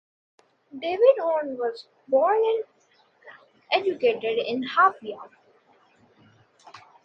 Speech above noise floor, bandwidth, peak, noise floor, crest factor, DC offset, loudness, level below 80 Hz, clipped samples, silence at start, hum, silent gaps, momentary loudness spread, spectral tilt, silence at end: 39 dB; 6.4 kHz; -6 dBFS; -63 dBFS; 20 dB; under 0.1%; -23 LUFS; -78 dBFS; under 0.1%; 0.75 s; none; none; 19 LU; -5 dB/octave; 0.3 s